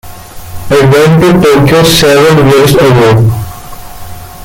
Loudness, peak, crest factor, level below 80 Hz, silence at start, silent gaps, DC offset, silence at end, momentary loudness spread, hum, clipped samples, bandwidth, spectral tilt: -5 LUFS; 0 dBFS; 6 dB; -28 dBFS; 0.05 s; none; under 0.1%; 0 s; 22 LU; none; 0.2%; 17.5 kHz; -5.5 dB/octave